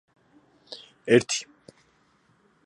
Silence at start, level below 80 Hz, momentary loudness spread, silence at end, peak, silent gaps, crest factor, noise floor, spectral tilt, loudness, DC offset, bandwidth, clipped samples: 0.7 s; -70 dBFS; 23 LU; 1.2 s; -6 dBFS; none; 24 dB; -64 dBFS; -4 dB/octave; -24 LUFS; under 0.1%; 11 kHz; under 0.1%